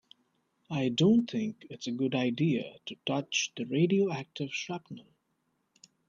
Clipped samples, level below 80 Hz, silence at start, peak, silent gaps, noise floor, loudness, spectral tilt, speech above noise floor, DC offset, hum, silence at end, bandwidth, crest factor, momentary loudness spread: under 0.1%; -72 dBFS; 0.7 s; -14 dBFS; none; -77 dBFS; -31 LUFS; -5.5 dB/octave; 47 dB; under 0.1%; none; 1.05 s; 7.6 kHz; 18 dB; 14 LU